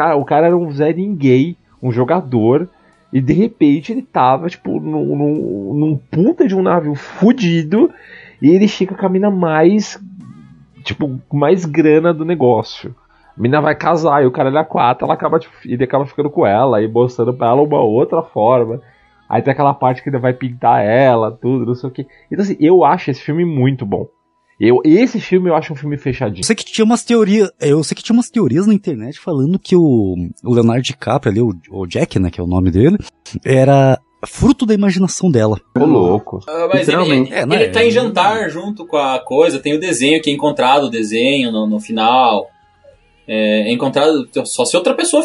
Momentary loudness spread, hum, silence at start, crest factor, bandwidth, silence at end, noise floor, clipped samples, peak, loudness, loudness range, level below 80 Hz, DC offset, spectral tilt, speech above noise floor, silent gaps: 9 LU; none; 0 s; 14 dB; 11.5 kHz; 0 s; -48 dBFS; under 0.1%; 0 dBFS; -14 LUFS; 2 LU; -44 dBFS; under 0.1%; -6 dB/octave; 35 dB; none